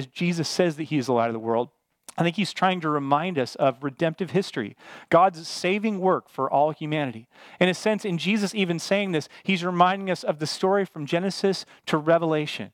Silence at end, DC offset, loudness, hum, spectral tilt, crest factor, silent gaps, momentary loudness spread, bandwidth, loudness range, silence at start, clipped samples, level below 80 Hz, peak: 0.05 s; under 0.1%; -24 LUFS; none; -5.5 dB/octave; 20 dB; none; 7 LU; 15.5 kHz; 1 LU; 0 s; under 0.1%; -74 dBFS; -4 dBFS